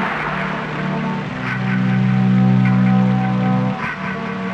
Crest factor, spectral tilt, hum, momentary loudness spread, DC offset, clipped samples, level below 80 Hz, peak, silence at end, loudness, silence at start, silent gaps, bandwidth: 12 dB; -8.5 dB/octave; none; 9 LU; under 0.1%; under 0.1%; -46 dBFS; -6 dBFS; 0 s; -18 LUFS; 0 s; none; 6.6 kHz